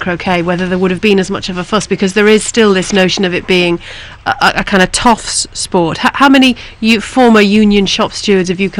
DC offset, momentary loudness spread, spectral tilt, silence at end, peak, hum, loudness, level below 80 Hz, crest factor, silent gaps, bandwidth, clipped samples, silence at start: under 0.1%; 8 LU; -4 dB/octave; 0 s; 0 dBFS; none; -10 LUFS; -34 dBFS; 10 dB; none; 15 kHz; under 0.1%; 0 s